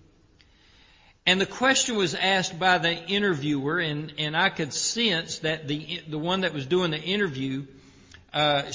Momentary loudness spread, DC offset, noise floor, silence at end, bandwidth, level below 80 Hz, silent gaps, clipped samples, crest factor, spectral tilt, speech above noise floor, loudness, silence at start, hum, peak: 9 LU; under 0.1%; -58 dBFS; 0 s; 7.8 kHz; -60 dBFS; none; under 0.1%; 22 dB; -3.5 dB/octave; 33 dB; -25 LUFS; 1.25 s; none; -4 dBFS